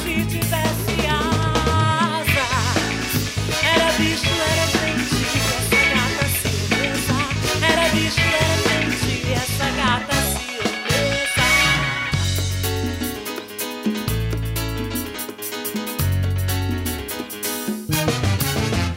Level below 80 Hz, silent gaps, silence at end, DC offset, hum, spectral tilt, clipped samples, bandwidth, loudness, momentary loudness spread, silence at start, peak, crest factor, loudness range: -34 dBFS; none; 0 s; under 0.1%; none; -4 dB/octave; under 0.1%; 16.5 kHz; -20 LUFS; 9 LU; 0 s; -6 dBFS; 14 dB; 6 LU